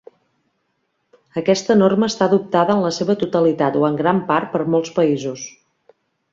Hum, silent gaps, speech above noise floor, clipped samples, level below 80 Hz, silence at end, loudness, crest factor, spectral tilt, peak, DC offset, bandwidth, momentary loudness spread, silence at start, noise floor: none; none; 53 dB; under 0.1%; -62 dBFS; 0.85 s; -18 LUFS; 16 dB; -6 dB/octave; -2 dBFS; under 0.1%; 7.6 kHz; 8 LU; 1.35 s; -70 dBFS